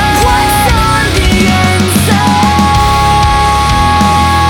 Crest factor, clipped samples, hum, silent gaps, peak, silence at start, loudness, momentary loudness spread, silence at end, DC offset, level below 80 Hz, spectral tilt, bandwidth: 8 dB; under 0.1%; none; none; 0 dBFS; 0 s; -8 LUFS; 1 LU; 0 s; under 0.1%; -18 dBFS; -4.5 dB/octave; 18.5 kHz